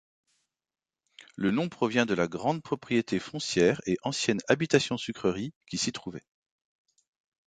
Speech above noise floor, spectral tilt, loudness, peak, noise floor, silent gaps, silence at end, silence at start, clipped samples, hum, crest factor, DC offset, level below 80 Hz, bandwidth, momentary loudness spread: over 62 dB; -4.5 dB/octave; -28 LUFS; -8 dBFS; under -90 dBFS; 5.56-5.61 s; 1.3 s; 1.4 s; under 0.1%; none; 22 dB; under 0.1%; -64 dBFS; 9.4 kHz; 10 LU